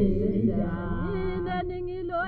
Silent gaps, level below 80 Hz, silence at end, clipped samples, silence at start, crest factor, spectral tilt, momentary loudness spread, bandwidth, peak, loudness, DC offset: none; -36 dBFS; 0 s; under 0.1%; 0 s; 14 dB; -11 dB/octave; 6 LU; 4.7 kHz; -12 dBFS; -29 LUFS; under 0.1%